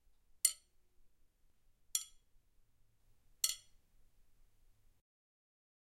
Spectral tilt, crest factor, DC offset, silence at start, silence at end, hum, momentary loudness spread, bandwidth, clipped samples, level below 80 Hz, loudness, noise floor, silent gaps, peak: 4 dB/octave; 36 dB; under 0.1%; 0.45 s; 2.4 s; none; 17 LU; 16 kHz; under 0.1%; -72 dBFS; -37 LUFS; -70 dBFS; none; -12 dBFS